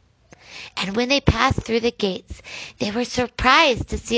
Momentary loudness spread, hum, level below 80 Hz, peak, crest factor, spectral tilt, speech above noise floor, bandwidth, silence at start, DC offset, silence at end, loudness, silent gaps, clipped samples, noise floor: 19 LU; none; -36 dBFS; 0 dBFS; 22 dB; -4.5 dB/octave; 30 dB; 8 kHz; 0.5 s; under 0.1%; 0 s; -20 LUFS; none; under 0.1%; -50 dBFS